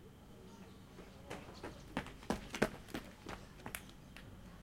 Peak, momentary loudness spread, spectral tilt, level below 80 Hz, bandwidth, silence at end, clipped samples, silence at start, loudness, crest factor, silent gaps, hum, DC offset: -16 dBFS; 17 LU; -4.5 dB/octave; -60 dBFS; 16.5 kHz; 0 s; under 0.1%; 0 s; -46 LUFS; 30 dB; none; none; under 0.1%